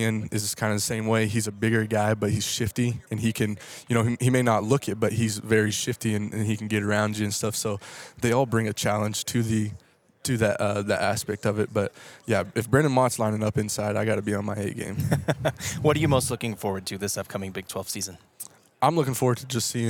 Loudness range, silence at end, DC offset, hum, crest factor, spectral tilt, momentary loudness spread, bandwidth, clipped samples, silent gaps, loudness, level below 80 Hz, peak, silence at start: 2 LU; 0 s; under 0.1%; none; 20 dB; -5 dB/octave; 8 LU; 18.5 kHz; under 0.1%; none; -26 LUFS; -56 dBFS; -4 dBFS; 0 s